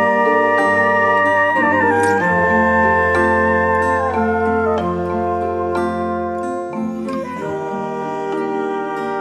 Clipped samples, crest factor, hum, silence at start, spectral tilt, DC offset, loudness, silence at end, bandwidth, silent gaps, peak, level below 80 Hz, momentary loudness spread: under 0.1%; 14 dB; none; 0 s; -6.5 dB/octave; under 0.1%; -17 LUFS; 0 s; 12.5 kHz; none; -2 dBFS; -44 dBFS; 10 LU